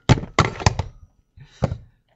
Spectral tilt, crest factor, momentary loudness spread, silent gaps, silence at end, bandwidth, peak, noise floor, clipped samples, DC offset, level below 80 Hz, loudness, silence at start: -5.5 dB/octave; 22 dB; 16 LU; none; 0.4 s; 8.2 kHz; 0 dBFS; -49 dBFS; under 0.1%; under 0.1%; -36 dBFS; -22 LUFS; 0.1 s